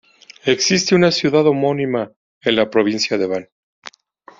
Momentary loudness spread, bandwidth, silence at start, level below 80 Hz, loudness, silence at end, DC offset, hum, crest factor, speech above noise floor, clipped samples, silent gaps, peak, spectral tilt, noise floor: 10 LU; 7.6 kHz; 0.45 s; -58 dBFS; -17 LUFS; 0.95 s; under 0.1%; none; 16 dB; 31 dB; under 0.1%; 2.16-2.41 s; -2 dBFS; -4 dB/octave; -48 dBFS